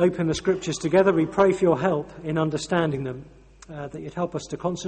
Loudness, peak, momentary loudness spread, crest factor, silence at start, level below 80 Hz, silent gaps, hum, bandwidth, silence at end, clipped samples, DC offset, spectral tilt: -24 LUFS; -6 dBFS; 15 LU; 18 dB; 0 s; -52 dBFS; none; none; 8.8 kHz; 0 s; under 0.1%; under 0.1%; -6 dB/octave